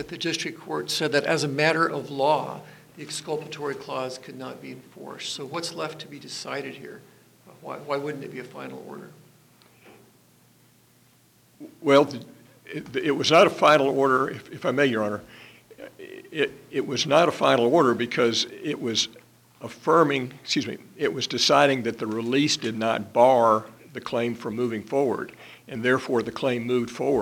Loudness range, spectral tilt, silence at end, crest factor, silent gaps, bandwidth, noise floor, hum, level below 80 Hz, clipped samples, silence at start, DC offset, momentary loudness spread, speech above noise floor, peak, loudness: 13 LU; -4 dB/octave; 0 s; 20 dB; none; 19 kHz; -59 dBFS; none; -68 dBFS; under 0.1%; 0 s; under 0.1%; 20 LU; 35 dB; -4 dBFS; -24 LUFS